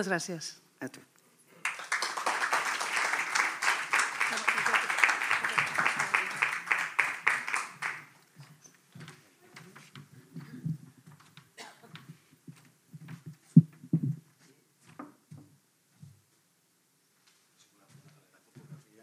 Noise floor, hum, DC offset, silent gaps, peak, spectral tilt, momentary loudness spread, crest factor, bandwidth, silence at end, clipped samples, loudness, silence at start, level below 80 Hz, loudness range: -71 dBFS; none; under 0.1%; none; -6 dBFS; -4 dB/octave; 25 LU; 28 dB; 15.5 kHz; 0.25 s; under 0.1%; -29 LUFS; 0 s; -88 dBFS; 19 LU